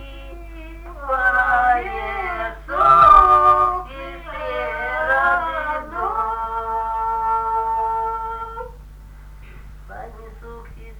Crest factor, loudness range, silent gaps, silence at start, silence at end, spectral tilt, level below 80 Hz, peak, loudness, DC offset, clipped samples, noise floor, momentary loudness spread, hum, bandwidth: 20 dB; 10 LU; none; 0 s; 0 s; -5.5 dB/octave; -36 dBFS; 0 dBFS; -18 LUFS; under 0.1%; under 0.1%; -39 dBFS; 25 LU; none; 19 kHz